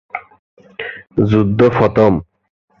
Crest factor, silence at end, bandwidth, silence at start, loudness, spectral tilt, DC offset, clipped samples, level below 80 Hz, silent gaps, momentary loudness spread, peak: 16 dB; 0.6 s; 6.8 kHz; 0.15 s; -14 LUFS; -9 dB/octave; under 0.1%; under 0.1%; -40 dBFS; 0.39-0.57 s; 18 LU; 0 dBFS